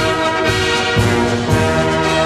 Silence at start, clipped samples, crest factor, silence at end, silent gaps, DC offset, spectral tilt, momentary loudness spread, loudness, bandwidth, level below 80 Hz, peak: 0 s; under 0.1%; 12 dB; 0 s; none; under 0.1%; -5 dB/octave; 1 LU; -15 LUFS; 14 kHz; -32 dBFS; -2 dBFS